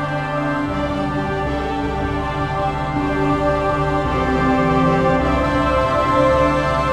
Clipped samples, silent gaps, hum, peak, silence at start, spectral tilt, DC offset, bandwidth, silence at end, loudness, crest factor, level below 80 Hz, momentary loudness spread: under 0.1%; none; none; -4 dBFS; 0 s; -7 dB/octave; under 0.1%; 12 kHz; 0 s; -18 LUFS; 14 dB; -30 dBFS; 6 LU